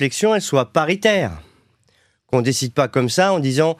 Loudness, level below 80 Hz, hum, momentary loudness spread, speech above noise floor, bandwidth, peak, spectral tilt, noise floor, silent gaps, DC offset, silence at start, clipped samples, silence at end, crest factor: -18 LUFS; -52 dBFS; none; 4 LU; 43 dB; 15 kHz; -2 dBFS; -4.5 dB/octave; -61 dBFS; none; under 0.1%; 0 s; under 0.1%; 0.05 s; 16 dB